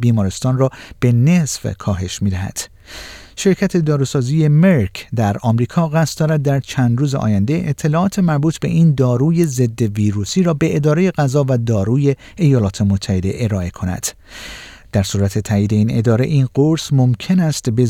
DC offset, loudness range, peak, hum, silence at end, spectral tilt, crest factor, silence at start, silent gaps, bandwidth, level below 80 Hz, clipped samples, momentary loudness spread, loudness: under 0.1%; 3 LU; -2 dBFS; none; 0 s; -6.5 dB/octave; 14 dB; 0 s; none; 16 kHz; -44 dBFS; under 0.1%; 8 LU; -16 LUFS